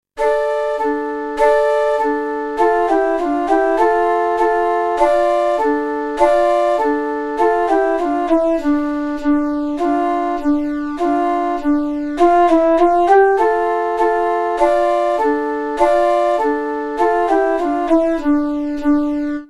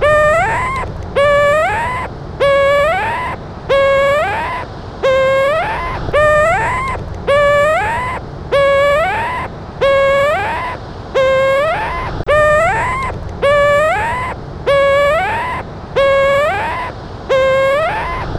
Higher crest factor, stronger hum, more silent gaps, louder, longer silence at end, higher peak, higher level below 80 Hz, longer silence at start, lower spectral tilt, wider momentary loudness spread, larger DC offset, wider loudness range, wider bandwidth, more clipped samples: about the same, 16 dB vs 14 dB; neither; neither; about the same, -16 LUFS vs -14 LUFS; about the same, 0.05 s vs 0 s; about the same, 0 dBFS vs 0 dBFS; second, -42 dBFS vs -32 dBFS; first, 0.15 s vs 0 s; about the same, -5 dB/octave vs -5 dB/octave; second, 6 LU vs 11 LU; neither; about the same, 3 LU vs 2 LU; second, 11.5 kHz vs 13.5 kHz; neither